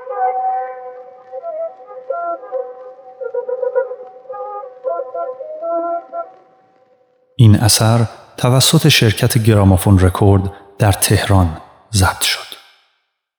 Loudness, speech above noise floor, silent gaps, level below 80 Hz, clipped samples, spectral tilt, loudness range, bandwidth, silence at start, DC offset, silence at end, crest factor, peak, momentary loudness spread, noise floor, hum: -15 LUFS; 55 dB; none; -44 dBFS; under 0.1%; -5 dB/octave; 13 LU; over 20 kHz; 0 s; under 0.1%; 0.85 s; 16 dB; 0 dBFS; 21 LU; -67 dBFS; none